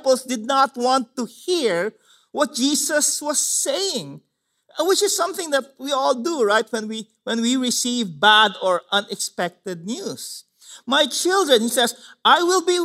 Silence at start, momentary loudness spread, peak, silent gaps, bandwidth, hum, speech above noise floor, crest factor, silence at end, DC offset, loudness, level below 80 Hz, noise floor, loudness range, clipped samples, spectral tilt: 0.05 s; 13 LU; -2 dBFS; none; 16 kHz; none; 37 dB; 20 dB; 0 s; under 0.1%; -20 LUFS; -80 dBFS; -58 dBFS; 3 LU; under 0.1%; -1.5 dB/octave